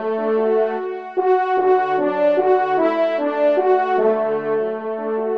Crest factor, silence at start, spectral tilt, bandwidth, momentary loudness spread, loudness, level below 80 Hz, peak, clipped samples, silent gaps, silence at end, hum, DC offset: 12 dB; 0 s; -7.5 dB/octave; 5.8 kHz; 6 LU; -18 LUFS; -72 dBFS; -6 dBFS; under 0.1%; none; 0 s; none; 0.2%